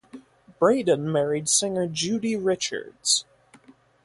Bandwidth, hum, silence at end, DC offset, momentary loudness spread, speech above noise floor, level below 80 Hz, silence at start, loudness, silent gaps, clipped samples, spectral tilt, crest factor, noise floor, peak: 11.5 kHz; none; 0.8 s; under 0.1%; 6 LU; 31 dB; -66 dBFS; 0.15 s; -23 LUFS; none; under 0.1%; -3 dB/octave; 20 dB; -55 dBFS; -6 dBFS